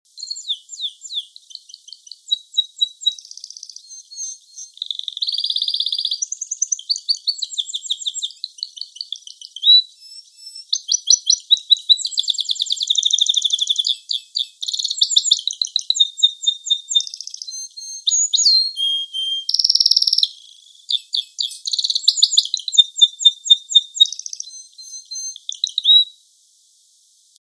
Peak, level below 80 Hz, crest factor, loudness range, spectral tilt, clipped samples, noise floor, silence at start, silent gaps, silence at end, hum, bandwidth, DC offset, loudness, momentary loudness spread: 0 dBFS; -74 dBFS; 20 dB; 9 LU; 6.5 dB/octave; under 0.1%; -55 dBFS; 0.15 s; none; 1.3 s; none; 11 kHz; under 0.1%; -16 LUFS; 18 LU